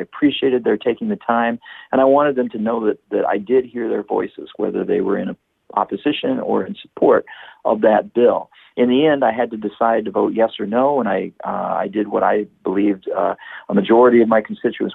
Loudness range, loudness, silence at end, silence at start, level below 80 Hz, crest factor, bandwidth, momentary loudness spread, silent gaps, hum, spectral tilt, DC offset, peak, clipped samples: 4 LU; -18 LUFS; 0 s; 0 s; -60 dBFS; 14 dB; 4.1 kHz; 9 LU; none; none; -9 dB/octave; under 0.1%; -4 dBFS; under 0.1%